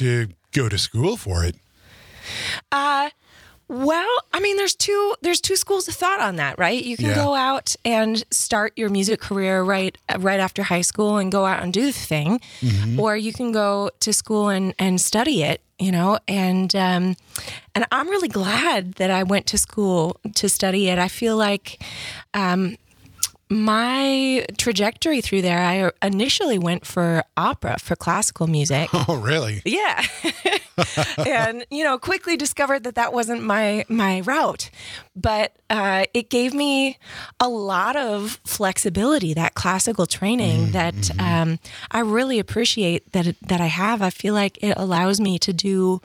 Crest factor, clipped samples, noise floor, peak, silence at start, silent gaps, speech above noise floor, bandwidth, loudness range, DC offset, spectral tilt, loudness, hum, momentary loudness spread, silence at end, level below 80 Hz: 22 dB; under 0.1%; -49 dBFS; 0 dBFS; 0 s; none; 28 dB; 18.5 kHz; 2 LU; under 0.1%; -4 dB/octave; -21 LUFS; none; 5 LU; 0.05 s; -50 dBFS